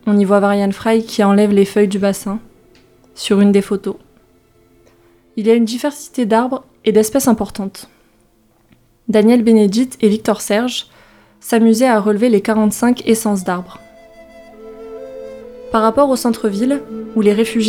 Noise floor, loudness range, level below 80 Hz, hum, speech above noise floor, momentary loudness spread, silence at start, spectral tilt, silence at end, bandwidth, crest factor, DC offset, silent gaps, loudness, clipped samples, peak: -54 dBFS; 5 LU; -52 dBFS; none; 41 dB; 18 LU; 0.05 s; -5.5 dB/octave; 0 s; 16.5 kHz; 16 dB; under 0.1%; none; -15 LUFS; under 0.1%; 0 dBFS